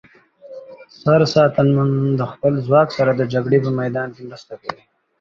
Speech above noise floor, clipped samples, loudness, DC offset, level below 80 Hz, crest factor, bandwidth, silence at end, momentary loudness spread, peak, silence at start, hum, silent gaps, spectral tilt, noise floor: 25 dB; under 0.1%; -17 LUFS; under 0.1%; -54 dBFS; 16 dB; 7.4 kHz; 0.45 s; 20 LU; -2 dBFS; 0.45 s; none; none; -7.5 dB/octave; -42 dBFS